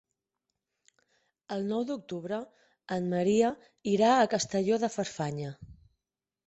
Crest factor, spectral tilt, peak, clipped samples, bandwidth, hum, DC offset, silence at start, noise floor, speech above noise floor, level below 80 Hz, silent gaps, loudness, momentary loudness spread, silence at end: 18 dB; -5 dB/octave; -12 dBFS; under 0.1%; 8.4 kHz; none; under 0.1%; 1.5 s; -89 dBFS; 60 dB; -66 dBFS; none; -30 LUFS; 14 LU; 0.75 s